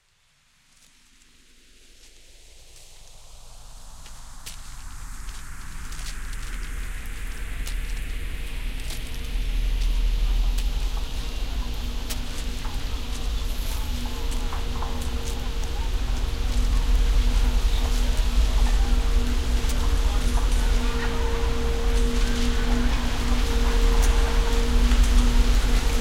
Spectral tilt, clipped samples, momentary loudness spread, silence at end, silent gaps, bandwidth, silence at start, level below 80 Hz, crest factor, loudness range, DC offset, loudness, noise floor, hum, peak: -4.5 dB/octave; under 0.1%; 17 LU; 0 s; none; 15.5 kHz; 2.55 s; -24 dBFS; 16 dB; 15 LU; under 0.1%; -27 LUFS; -63 dBFS; none; -8 dBFS